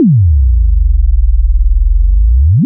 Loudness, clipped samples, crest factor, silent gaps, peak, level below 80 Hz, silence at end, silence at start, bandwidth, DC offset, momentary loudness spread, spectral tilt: -12 LUFS; under 0.1%; 6 dB; none; -2 dBFS; -8 dBFS; 0 s; 0 s; 0.4 kHz; under 0.1%; 4 LU; -21 dB/octave